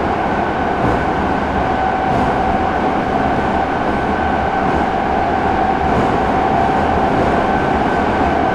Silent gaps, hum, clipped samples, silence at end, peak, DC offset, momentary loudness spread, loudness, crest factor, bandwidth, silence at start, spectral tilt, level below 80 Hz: none; none; under 0.1%; 0 s; -4 dBFS; under 0.1%; 2 LU; -16 LUFS; 12 dB; 11 kHz; 0 s; -7 dB/octave; -30 dBFS